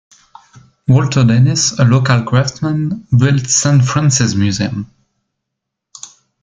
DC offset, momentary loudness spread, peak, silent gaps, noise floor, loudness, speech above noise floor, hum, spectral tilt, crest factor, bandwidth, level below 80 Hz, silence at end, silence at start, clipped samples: under 0.1%; 14 LU; 0 dBFS; none; -78 dBFS; -13 LUFS; 66 dB; none; -5 dB/octave; 14 dB; 9.4 kHz; -46 dBFS; 0.35 s; 0.9 s; under 0.1%